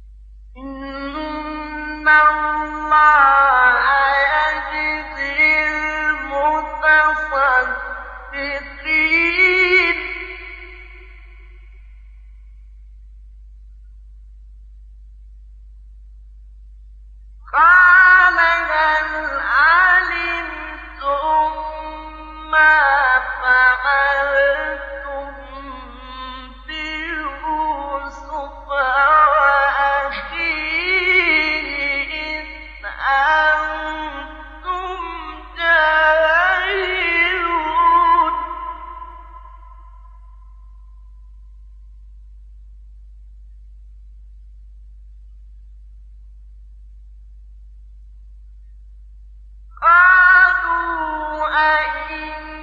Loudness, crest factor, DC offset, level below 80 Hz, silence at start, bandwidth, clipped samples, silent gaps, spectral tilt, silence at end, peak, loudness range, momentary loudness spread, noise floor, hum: -15 LUFS; 16 dB; under 0.1%; -40 dBFS; 0 s; 7.4 kHz; under 0.1%; none; -4.5 dB/octave; 0 s; -2 dBFS; 8 LU; 20 LU; -40 dBFS; none